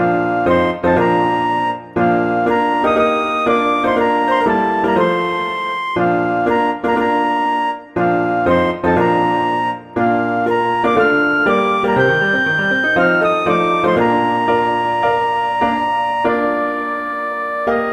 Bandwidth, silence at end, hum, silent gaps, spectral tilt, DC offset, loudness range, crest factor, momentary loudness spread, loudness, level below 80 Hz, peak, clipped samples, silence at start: 11 kHz; 0 s; none; none; -6.5 dB/octave; under 0.1%; 2 LU; 14 dB; 5 LU; -16 LUFS; -48 dBFS; -2 dBFS; under 0.1%; 0 s